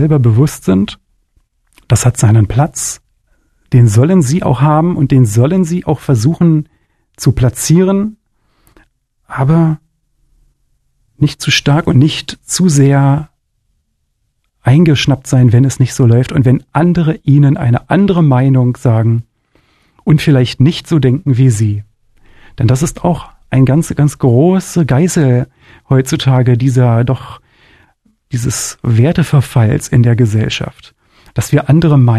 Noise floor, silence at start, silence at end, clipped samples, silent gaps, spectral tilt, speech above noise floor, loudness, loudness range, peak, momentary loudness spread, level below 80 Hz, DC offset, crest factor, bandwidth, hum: -63 dBFS; 0 s; 0 s; under 0.1%; none; -6.5 dB/octave; 54 dB; -11 LUFS; 4 LU; 0 dBFS; 8 LU; -36 dBFS; under 0.1%; 12 dB; 13 kHz; none